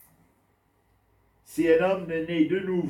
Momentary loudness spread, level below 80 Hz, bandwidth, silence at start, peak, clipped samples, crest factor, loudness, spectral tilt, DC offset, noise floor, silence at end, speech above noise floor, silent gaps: 7 LU; -62 dBFS; 14.5 kHz; 1.5 s; -10 dBFS; under 0.1%; 18 dB; -25 LUFS; -7 dB/octave; under 0.1%; -67 dBFS; 0 s; 43 dB; none